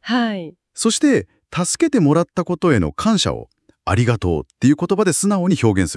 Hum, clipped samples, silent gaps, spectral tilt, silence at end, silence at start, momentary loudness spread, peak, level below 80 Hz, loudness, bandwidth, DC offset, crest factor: none; under 0.1%; none; -5 dB/octave; 0 s; 0.05 s; 7 LU; -2 dBFS; -46 dBFS; -18 LUFS; 12 kHz; under 0.1%; 16 dB